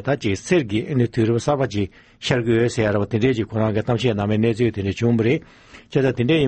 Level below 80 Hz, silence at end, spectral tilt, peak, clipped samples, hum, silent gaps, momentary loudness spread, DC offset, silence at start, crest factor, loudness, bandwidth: -48 dBFS; 0 s; -6.5 dB/octave; -4 dBFS; under 0.1%; none; none; 4 LU; under 0.1%; 0 s; 16 dB; -21 LUFS; 8.8 kHz